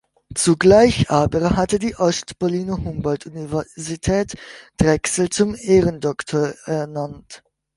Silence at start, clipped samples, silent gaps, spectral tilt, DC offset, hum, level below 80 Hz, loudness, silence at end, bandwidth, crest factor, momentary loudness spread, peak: 0.3 s; under 0.1%; none; -5 dB/octave; under 0.1%; none; -40 dBFS; -19 LUFS; 0.4 s; 11.5 kHz; 18 dB; 14 LU; -2 dBFS